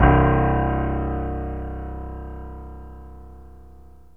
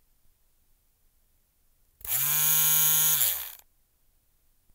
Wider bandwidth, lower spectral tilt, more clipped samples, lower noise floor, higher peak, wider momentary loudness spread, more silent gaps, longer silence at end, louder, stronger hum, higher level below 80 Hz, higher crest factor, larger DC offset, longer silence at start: second, 3.3 kHz vs 16 kHz; first, -10.5 dB/octave vs 0.5 dB/octave; neither; second, -47 dBFS vs -67 dBFS; first, -2 dBFS vs -6 dBFS; first, 24 LU vs 16 LU; neither; second, 0.35 s vs 1.2 s; about the same, -23 LUFS vs -21 LUFS; first, 50 Hz at -60 dBFS vs none; first, -28 dBFS vs -66 dBFS; about the same, 22 dB vs 24 dB; first, 0.4% vs under 0.1%; second, 0 s vs 2.05 s